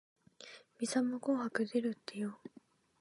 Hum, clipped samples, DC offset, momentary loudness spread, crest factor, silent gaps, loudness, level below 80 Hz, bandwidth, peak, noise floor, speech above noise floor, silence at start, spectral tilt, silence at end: none; under 0.1%; under 0.1%; 19 LU; 20 dB; none; -37 LUFS; -88 dBFS; 11.5 kHz; -20 dBFS; -57 dBFS; 21 dB; 0.4 s; -4.5 dB/octave; 0.55 s